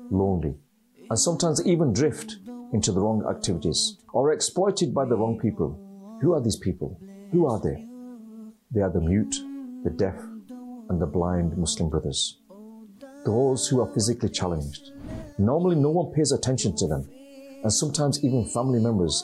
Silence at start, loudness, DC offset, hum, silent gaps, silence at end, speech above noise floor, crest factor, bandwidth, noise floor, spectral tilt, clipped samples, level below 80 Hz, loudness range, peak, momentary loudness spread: 0 s; -25 LUFS; under 0.1%; none; none; 0 s; 21 dB; 14 dB; 13 kHz; -46 dBFS; -5 dB/octave; under 0.1%; -48 dBFS; 4 LU; -12 dBFS; 17 LU